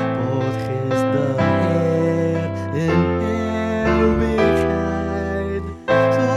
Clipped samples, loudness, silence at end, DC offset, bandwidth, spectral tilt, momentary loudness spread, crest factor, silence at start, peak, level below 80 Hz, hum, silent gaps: under 0.1%; -19 LUFS; 0 s; under 0.1%; 13 kHz; -7.5 dB/octave; 6 LU; 14 dB; 0 s; -4 dBFS; -34 dBFS; none; none